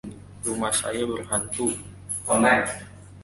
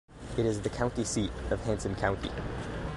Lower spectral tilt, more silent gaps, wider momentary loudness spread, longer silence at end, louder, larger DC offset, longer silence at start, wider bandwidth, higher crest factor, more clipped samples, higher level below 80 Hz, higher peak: second, -3 dB/octave vs -5.5 dB/octave; neither; first, 16 LU vs 7 LU; about the same, 0 s vs 0 s; first, -24 LUFS vs -32 LUFS; neither; about the same, 0.05 s vs 0.1 s; about the same, 12 kHz vs 11.5 kHz; about the same, 22 dB vs 18 dB; neither; second, -52 dBFS vs -42 dBFS; first, -4 dBFS vs -14 dBFS